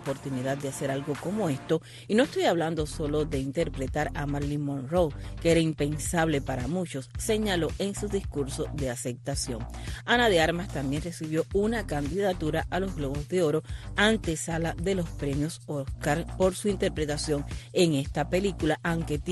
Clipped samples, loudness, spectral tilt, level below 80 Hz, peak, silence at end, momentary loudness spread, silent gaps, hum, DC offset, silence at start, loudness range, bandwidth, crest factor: under 0.1%; -28 LUFS; -5 dB/octave; -42 dBFS; -8 dBFS; 0 s; 7 LU; none; none; under 0.1%; 0 s; 2 LU; 12.5 kHz; 20 dB